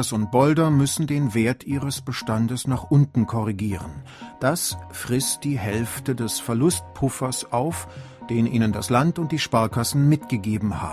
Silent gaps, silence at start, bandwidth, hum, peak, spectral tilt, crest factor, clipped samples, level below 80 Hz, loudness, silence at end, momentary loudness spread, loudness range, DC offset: none; 0 s; 16 kHz; none; -4 dBFS; -5.5 dB/octave; 18 dB; under 0.1%; -46 dBFS; -23 LUFS; 0 s; 8 LU; 3 LU; under 0.1%